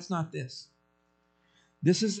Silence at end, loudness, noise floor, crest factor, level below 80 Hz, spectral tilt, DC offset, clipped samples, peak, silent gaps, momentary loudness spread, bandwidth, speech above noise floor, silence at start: 0 s; -30 LUFS; -71 dBFS; 20 dB; -76 dBFS; -5.5 dB/octave; under 0.1%; under 0.1%; -12 dBFS; none; 16 LU; 9.2 kHz; 42 dB; 0 s